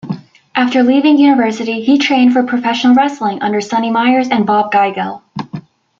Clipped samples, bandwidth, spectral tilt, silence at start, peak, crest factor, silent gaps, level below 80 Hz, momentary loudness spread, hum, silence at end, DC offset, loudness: under 0.1%; 7.4 kHz; -5.5 dB/octave; 0.05 s; -2 dBFS; 12 dB; none; -60 dBFS; 16 LU; none; 0.4 s; under 0.1%; -12 LUFS